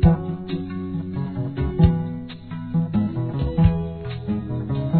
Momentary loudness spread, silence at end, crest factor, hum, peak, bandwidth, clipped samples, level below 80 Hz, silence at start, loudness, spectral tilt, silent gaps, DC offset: 11 LU; 0 s; 18 dB; none; -2 dBFS; 4.5 kHz; under 0.1%; -30 dBFS; 0 s; -24 LUFS; -12.5 dB/octave; none; 0.3%